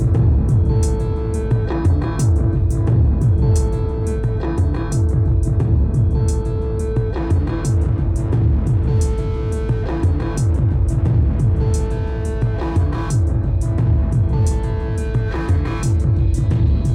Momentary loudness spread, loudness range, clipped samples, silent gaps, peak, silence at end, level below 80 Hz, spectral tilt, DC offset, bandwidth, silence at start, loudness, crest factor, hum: 5 LU; 1 LU; under 0.1%; none; -6 dBFS; 0 s; -20 dBFS; -8 dB/octave; under 0.1%; 11 kHz; 0 s; -18 LUFS; 10 dB; none